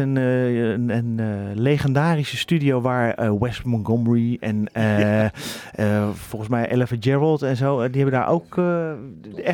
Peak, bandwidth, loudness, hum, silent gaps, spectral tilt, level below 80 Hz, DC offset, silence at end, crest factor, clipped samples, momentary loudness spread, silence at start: -6 dBFS; 18 kHz; -21 LUFS; none; none; -7.5 dB/octave; -52 dBFS; under 0.1%; 0 s; 14 dB; under 0.1%; 6 LU; 0 s